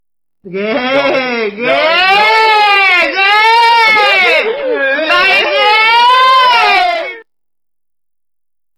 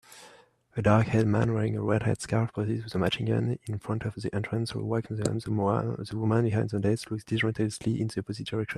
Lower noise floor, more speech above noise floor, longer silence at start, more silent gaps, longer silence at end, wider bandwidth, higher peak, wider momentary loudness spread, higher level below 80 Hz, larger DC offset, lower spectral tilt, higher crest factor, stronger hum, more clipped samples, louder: first, -88 dBFS vs -57 dBFS; first, 75 dB vs 29 dB; first, 0.45 s vs 0.1 s; neither; first, 1.55 s vs 0 s; first, 15.5 kHz vs 12 kHz; first, -2 dBFS vs -6 dBFS; about the same, 8 LU vs 8 LU; about the same, -54 dBFS vs -56 dBFS; neither; second, -2.5 dB/octave vs -6.5 dB/octave; second, 10 dB vs 22 dB; neither; neither; first, -8 LUFS vs -29 LUFS